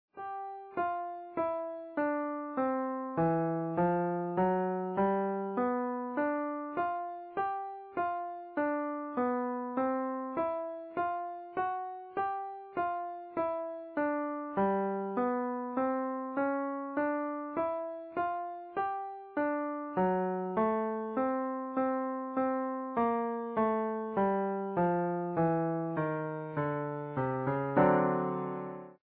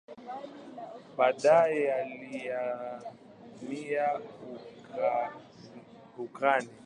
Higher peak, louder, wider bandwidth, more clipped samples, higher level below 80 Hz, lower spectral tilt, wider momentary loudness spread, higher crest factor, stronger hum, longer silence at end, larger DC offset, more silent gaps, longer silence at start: second, -14 dBFS vs -10 dBFS; second, -33 LUFS vs -30 LUFS; second, 4.6 kHz vs 10 kHz; neither; first, -68 dBFS vs -78 dBFS; first, -7.5 dB/octave vs -5 dB/octave; second, 8 LU vs 24 LU; about the same, 18 dB vs 22 dB; neither; about the same, 0.1 s vs 0.05 s; neither; neither; about the same, 0.15 s vs 0.1 s